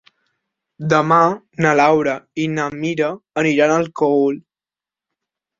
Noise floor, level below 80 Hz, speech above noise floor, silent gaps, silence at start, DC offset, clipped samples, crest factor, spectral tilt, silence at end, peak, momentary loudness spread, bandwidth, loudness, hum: under -90 dBFS; -60 dBFS; over 73 dB; none; 0.8 s; under 0.1%; under 0.1%; 16 dB; -6 dB/octave; 1.2 s; -2 dBFS; 9 LU; 7.6 kHz; -17 LUFS; none